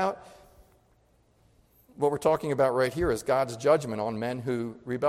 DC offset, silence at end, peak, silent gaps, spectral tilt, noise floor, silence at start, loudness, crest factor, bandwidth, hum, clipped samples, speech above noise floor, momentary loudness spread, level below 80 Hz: under 0.1%; 0 s; -10 dBFS; none; -6 dB/octave; -65 dBFS; 0 s; -27 LUFS; 18 dB; 16 kHz; none; under 0.1%; 38 dB; 7 LU; -54 dBFS